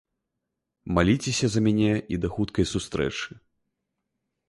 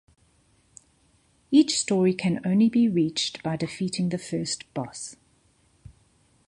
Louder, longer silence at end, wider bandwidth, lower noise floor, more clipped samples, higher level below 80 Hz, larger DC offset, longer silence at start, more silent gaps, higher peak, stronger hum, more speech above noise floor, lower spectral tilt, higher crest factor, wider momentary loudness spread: about the same, -25 LUFS vs -25 LUFS; second, 1.2 s vs 1.35 s; about the same, 11.5 kHz vs 11.5 kHz; first, -83 dBFS vs -64 dBFS; neither; first, -44 dBFS vs -62 dBFS; neither; second, 0.85 s vs 1.5 s; neither; about the same, -8 dBFS vs -6 dBFS; neither; first, 58 dB vs 40 dB; about the same, -5.5 dB/octave vs -5 dB/octave; about the same, 20 dB vs 20 dB; second, 9 LU vs 13 LU